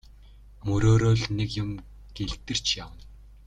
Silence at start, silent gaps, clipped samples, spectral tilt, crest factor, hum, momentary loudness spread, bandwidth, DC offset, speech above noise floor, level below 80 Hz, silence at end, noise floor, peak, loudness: 0.65 s; none; under 0.1%; -5.5 dB/octave; 18 dB; none; 18 LU; 9.2 kHz; under 0.1%; 25 dB; -42 dBFS; 0.2 s; -49 dBFS; -10 dBFS; -26 LUFS